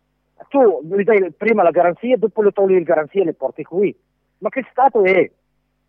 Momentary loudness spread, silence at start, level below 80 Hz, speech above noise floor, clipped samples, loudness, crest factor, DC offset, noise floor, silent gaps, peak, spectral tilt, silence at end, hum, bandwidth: 9 LU; 0.55 s; -68 dBFS; 52 dB; under 0.1%; -17 LUFS; 14 dB; under 0.1%; -68 dBFS; none; -2 dBFS; -9.5 dB/octave; 0.6 s; none; 4.6 kHz